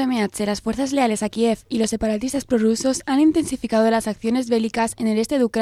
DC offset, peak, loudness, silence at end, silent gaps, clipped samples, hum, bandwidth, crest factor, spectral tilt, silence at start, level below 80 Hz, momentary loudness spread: under 0.1%; -6 dBFS; -21 LUFS; 0 s; none; under 0.1%; none; 14 kHz; 14 dB; -4.5 dB/octave; 0 s; -48 dBFS; 5 LU